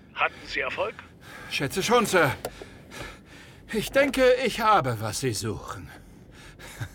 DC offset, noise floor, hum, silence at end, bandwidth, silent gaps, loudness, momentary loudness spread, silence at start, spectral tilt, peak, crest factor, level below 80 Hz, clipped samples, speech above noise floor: under 0.1%; -48 dBFS; none; 0 s; 19 kHz; none; -25 LUFS; 22 LU; 0.15 s; -4 dB/octave; -8 dBFS; 18 dB; -50 dBFS; under 0.1%; 22 dB